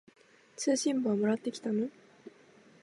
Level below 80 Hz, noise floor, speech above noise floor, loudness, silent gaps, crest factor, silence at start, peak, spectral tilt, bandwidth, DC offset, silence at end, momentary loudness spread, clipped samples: -86 dBFS; -60 dBFS; 29 dB; -32 LUFS; none; 16 dB; 0.6 s; -18 dBFS; -4.5 dB/octave; 11.5 kHz; under 0.1%; 0.55 s; 8 LU; under 0.1%